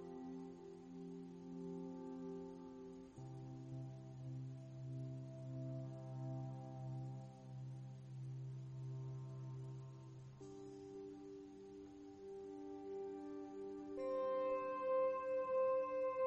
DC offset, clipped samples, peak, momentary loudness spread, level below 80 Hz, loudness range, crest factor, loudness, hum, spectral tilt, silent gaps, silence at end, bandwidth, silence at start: under 0.1%; under 0.1%; -30 dBFS; 15 LU; -78 dBFS; 10 LU; 16 dB; -48 LUFS; none; -8.5 dB/octave; none; 0 s; 8.2 kHz; 0 s